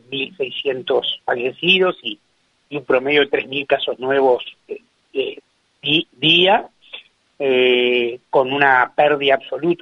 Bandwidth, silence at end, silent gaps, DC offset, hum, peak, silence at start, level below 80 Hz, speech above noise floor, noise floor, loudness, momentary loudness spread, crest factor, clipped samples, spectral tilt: 6.6 kHz; 0.05 s; none; under 0.1%; none; 0 dBFS; 0.1 s; -64 dBFS; 23 dB; -41 dBFS; -17 LUFS; 17 LU; 18 dB; under 0.1%; -6 dB/octave